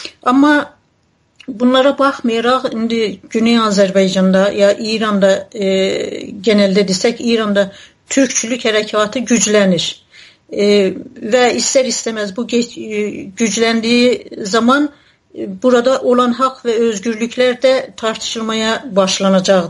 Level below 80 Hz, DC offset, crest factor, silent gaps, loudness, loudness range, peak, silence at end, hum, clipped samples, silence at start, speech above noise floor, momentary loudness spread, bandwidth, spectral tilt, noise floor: -56 dBFS; under 0.1%; 14 dB; none; -14 LUFS; 2 LU; 0 dBFS; 0 s; none; under 0.1%; 0 s; 44 dB; 9 LU; 11.5 kHz; -4 dB/octave; -58 dBFS